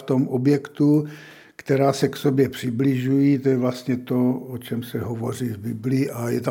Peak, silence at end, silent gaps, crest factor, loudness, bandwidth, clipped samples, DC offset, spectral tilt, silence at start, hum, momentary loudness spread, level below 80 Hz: -6 dBFS; 0 s; none; 16 dB; -22 LUFS; 17 kHz; under 0.1%; under 0.1%; -7.5 dB/octave; 0 s; none; 10 LU; -64 dBFS